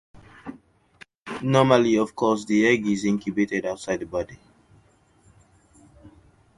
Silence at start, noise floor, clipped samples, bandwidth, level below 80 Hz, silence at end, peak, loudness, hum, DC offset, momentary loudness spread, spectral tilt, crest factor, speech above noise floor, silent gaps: 0.45 s; -59 dBFS; under 0.1%; 11.5 kHz; -58 dBFS; 0.5 s; -4 dBFS; -22 LUFS; none; under 0.1%; 24 LU; -6 dB/octave; 22 dB; 37 dB; 1.17-1.26 s